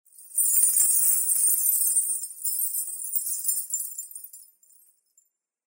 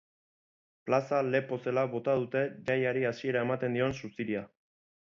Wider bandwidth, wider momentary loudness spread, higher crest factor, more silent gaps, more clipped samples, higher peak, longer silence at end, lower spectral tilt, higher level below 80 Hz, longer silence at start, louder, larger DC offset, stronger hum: first, 16.5 kHz vs 7.4 kHz; first, 12 LU vs 7 LU; about the same, 20 dB vs 18 dB; neither; neither; first, -6 dBFS vs -14 dBFS; first, 1.25 s vs 0.6 s; second, 7.5 dB/octave vs -7 dB/octave; second, under -90 dBFS vs -68 dBFS; second, 0.2 s vs 0.85 s; first, -21 LUFS vs -31 LUFS; neither; neither